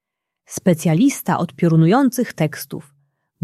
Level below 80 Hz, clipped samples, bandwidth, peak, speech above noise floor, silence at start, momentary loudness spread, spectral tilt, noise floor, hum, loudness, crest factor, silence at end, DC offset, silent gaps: -60 dBFS; under 0.1%; 14.5 kHz; -2 dBFS; 43 dB; 0.5 s; 17 LU; -6.5 dB/octave; -60 dBFS; none; -17 LUFS; 16 dB; 0.6 s; under 0.1%; none